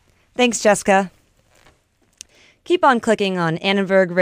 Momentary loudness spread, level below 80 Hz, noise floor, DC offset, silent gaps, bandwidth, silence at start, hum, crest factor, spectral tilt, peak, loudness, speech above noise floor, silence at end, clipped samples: 6 LU; -58 dBFS; -60 dBFS; under 0.1%; none; 15.5 kHz; 0.4 s; none; 18 dB; -4 dB/octave; -2 dBFS; -17 LUFS; 44 dB; 0 s; under 0.1%